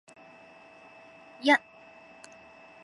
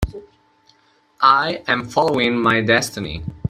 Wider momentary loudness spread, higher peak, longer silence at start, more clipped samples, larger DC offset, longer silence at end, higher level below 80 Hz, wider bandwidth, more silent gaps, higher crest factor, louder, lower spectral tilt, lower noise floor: first, 28 LU vs 13 LU; second, -10 dBFS vs 0 dBFS; first, 1.45 s vs 0 s; neither; neither; first, 1.25 s vs 0 s; second, -80 dBFS vs -38 dBFS; second, 11.5 kHz vs 16 kHz; neither; about the same, 24 dB vs 20 dB; second, -25 LUFS vs -17 LUFS; second, -2.5 dB/octave vs -4.5 dB/octave; second, -53 dBFS vs -58 dBFS